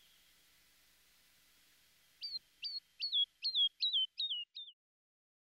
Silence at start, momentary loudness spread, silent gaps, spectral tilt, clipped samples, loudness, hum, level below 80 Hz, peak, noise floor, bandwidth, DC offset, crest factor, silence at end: 2.2 s; 16 LU; none; 2.5 dB/octave; under 0.1%; -36 LUFS; none; -88 dBFS; -26 dBFS; -70 dBFS; 16 kHz; under 0.1%; 16 dB; 0.7 s